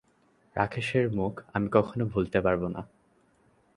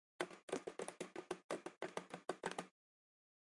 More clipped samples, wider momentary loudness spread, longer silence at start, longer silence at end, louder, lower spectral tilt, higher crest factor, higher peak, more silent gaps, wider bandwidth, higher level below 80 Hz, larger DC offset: neither; first, 11 LU vs 5 LU; first, 0.55 s vs 0.2 s; about the same, 0.9 s vs 0.85 s; first, -28 LUFS vs -49 LUFS; first, -7.5 dB/octave vs -3.5 dB/octave; about the same, 24 dB vs 28 dB; first, -6 dBFS vs -24 dBFS; second, none vs 0.43-0.48 s, 1.44-1.49 s, 1.77-1.81 s; about the same, 11.5 kHz vs 11.5 kHz; first, -52 dBFS vs -88 dBFS; neither